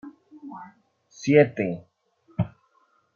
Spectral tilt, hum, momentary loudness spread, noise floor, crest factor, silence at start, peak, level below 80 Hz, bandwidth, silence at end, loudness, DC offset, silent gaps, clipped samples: -7 dB/octave; none; 25 LU; -66 dBFS; 22 dB; 0.05 s; -4 dBFS; -58 dBFS; 7 kHz; 0.65 s; -23 LUFS; under 0.1%; none; under 0.1%